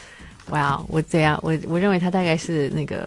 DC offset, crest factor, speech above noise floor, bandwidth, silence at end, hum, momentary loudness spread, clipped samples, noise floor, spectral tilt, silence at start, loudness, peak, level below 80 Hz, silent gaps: under 0.1%; 16 dB; 21 dB; 11.5 kHz; 0 s; none; 5 LU; under 0.1%; -42 dBFS; -6.5 dB/octave; 0 s; -22 LUFS; -6 dBFS; -48 dBFS; none